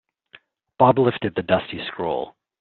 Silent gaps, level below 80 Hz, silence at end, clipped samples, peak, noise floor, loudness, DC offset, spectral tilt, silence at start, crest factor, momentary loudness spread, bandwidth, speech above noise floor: none; -58 dBFS; 0.3 s; under 0.1%; -2 dBFS; -53 dBFS; -21 LUFS; under 0.1%; -5 dB/octave; 0.8 s; 20 dB; 13 LU; 4.4 kHz; 32 dB